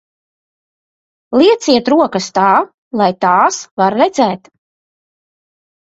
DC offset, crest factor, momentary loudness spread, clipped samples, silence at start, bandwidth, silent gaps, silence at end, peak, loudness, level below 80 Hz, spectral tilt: under 0.1%; 14 dB; 6 LU; under 0.1%; 1.3 s; 8 kHz; 2.74-2.91 s, 3.71-3.77 s; 1.55 s; 0 dBFS; -13 LUFS; -58 dBFS; -4.5 dB/octave